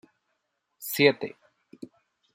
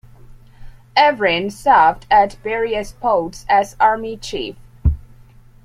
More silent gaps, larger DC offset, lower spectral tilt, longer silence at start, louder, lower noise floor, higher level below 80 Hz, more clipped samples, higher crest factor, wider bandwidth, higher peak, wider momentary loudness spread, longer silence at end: neither; neither; about the same, -4 dB/octave vs -5 dB/octave; first, 0.8 s vs 0.3 s; second, -24 LUFS vs -17 LUFS; first, -78 dBFS vs -44 dBFS; second, -80 dBFS vs -32 dBFS; neither; first, 26 dB vs 16 dB; first, 16 kHz vs 14.5 kHz; second, -6 dBFS vs -2 dBFS; first, 25 LU vs 13 LU; second, 0.5 s vs 0.65 s